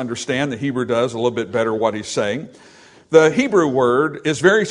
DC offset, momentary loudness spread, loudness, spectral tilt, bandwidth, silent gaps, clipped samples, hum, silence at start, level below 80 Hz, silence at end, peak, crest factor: under 0.1%; 8 LU; -18 LUFS; -5 dB/octave; 11 kHz; none; under 0.1%; none; 0 s; -60 dBFS; 0 s; 0 dBFS; 18 dB